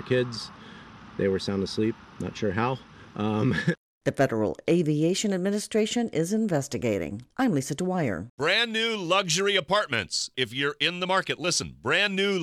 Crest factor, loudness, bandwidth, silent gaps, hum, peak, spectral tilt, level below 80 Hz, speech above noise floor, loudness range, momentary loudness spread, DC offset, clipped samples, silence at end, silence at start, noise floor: 18 dB; -26 LUFS; 15 kHz; 3.78-4.01 s, 8.30-8.38 s; none; -8 dBFS; -4 dB/octave; -60 dBFS; 20 dB; 4 LU; 9 LU; under 0.1%; under 0.1%; 0 s; 0 s; -46 dBFS